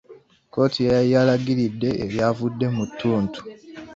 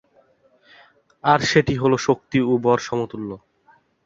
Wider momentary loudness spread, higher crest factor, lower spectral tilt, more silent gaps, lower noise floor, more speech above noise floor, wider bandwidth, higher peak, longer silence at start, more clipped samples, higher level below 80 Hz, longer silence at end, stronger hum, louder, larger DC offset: about the same, 13 LU vs 14 LU; about the same, 16 dB vs 20 dB; first, -7.5 dB/octave vs -5.5 dB/octave; neither; second, -49 dBFS vs -58 dBFS; second, 29 dB vs 39 dB; about the same, 7.6 kHz vs 7.8 kHz; second, -6 dBFS vs -2 dBFS; second, 0.1 s vs 1.25 s; neither; about the same, -52 dBFS vs -52 dBFS; second, 0 s vs 0.7 s; neither; about the same, -22 LUFS vs -20 LUFS; neither